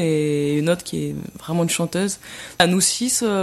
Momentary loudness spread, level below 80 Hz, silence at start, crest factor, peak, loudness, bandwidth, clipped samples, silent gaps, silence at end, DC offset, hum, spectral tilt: 12 LU; -54 dBFS; 0 s; 20 dB; -2 dBFS; -20 LUFS; 15.5 kHz; under 0.1%; none; 0 s; under 0.1%; none; -4 dB/octave